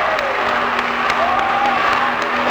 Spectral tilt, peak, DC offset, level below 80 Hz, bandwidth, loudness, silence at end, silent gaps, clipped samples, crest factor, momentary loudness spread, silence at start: -3.5 dB/octave; -2 dBFS; under 0.1%; -48 dBFS; over 20 kHz; -16 LUFS; 0 s; none; under 0.1%; 14 dB; 2 LU; 0 s